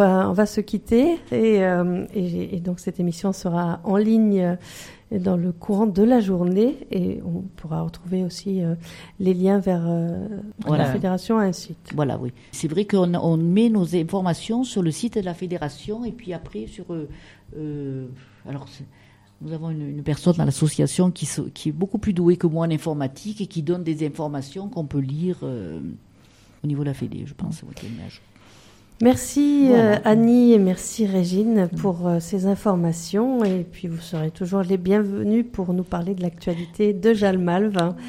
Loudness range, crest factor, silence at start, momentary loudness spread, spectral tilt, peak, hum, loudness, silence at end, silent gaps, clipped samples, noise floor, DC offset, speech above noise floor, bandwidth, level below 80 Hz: 11 LU; 18 dB; 0 s; 15 LU; -7 dB/octave; -2 dBFS; none; -22 LUFS; 0 s; none; under 0.1%; -52 dBFS; under 0.1%; 30 dB; 15.5 kHz; -50 dBFS